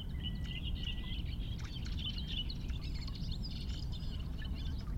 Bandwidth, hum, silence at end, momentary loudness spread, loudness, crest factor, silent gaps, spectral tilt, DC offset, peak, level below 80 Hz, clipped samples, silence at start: 16 kHz; none; 0 s; 3 LU; -41 LUFS; 14 dB; none; -5.5 dB/octave; under 0.1%; -26 dBFS; -40 dBFS; under 0.1%; 0 s